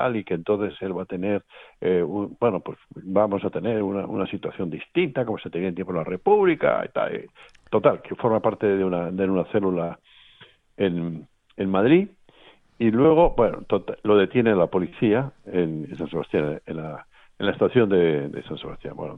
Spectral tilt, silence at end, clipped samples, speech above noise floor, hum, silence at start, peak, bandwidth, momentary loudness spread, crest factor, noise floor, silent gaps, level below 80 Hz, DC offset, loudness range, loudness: -9.5 dB/octave; 0 s; under 0.1%; 31 dB; none; 0 s; -4 dBFS; 4.1 kHz; 14 LU; 20 dB; -54 dBFS; none; -48 dBFS; under 0.1%; 5 LU; -23 LUFS